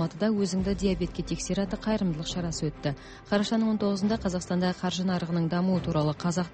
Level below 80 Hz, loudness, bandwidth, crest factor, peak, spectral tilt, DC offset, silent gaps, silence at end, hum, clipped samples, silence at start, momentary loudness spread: -46 dBFS; -28 LUFS; 8.8 kHz; 14 dB; -12 dBFS; -6 dB/octave; under 0.1%; none; 0 s; none; under 0.1%; 0 s; 5 LU